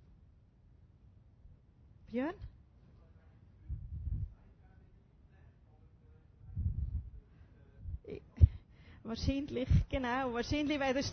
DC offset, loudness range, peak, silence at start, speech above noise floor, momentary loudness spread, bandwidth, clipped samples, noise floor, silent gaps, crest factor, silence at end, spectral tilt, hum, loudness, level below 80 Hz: under 0.1%; 14 LU; -10 dBFS; 1.45 s; 29 dB; 22 LU; 6.4 kHz; under 0.1%; -63 dBFS; none; 28 dB; 0 s; -6 dB/octave; none; -36 LUFS; -42 dBFS